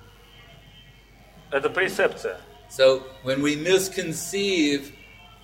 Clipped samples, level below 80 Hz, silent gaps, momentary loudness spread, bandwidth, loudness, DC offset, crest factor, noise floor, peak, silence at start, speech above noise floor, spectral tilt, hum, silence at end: under 0.1%; -56 dBFS; none; 14 LU; 16.5 kHz; -23 LUFS; under 0.1%; 18 dB; -51 dBFS; -6 dBFS; 0.75 s; 28 dB; -3.5 dB/octave; none; 0.4 s